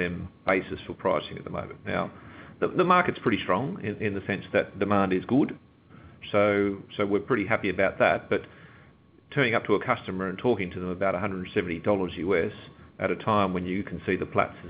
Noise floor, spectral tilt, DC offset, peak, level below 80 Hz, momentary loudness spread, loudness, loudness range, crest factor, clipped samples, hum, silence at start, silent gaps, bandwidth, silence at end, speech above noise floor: -56 dBFS; -10 dB/octave; under 0.1%; -6 dBFS; -54 dBFS; 9 LU; -27 LUFS; 2 LU; 22 dB; under 0.1%; none; 0 s; none; 4 kHz; 0 s; 29 dB